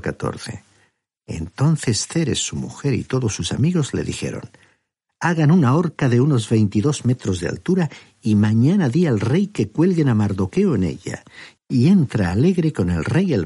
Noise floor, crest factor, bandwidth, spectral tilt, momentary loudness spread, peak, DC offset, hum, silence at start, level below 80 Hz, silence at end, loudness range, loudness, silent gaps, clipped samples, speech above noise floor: -68 dBFS; 14 dB; 11.5 kHz; -6.5 dB/octave; 12 LU; -6 dBFS; under 0.1%; none; 0.05 s; -48 dBFS; 0 s; 4 LU; -19 LUFS; none; under 0.1%; 50 dB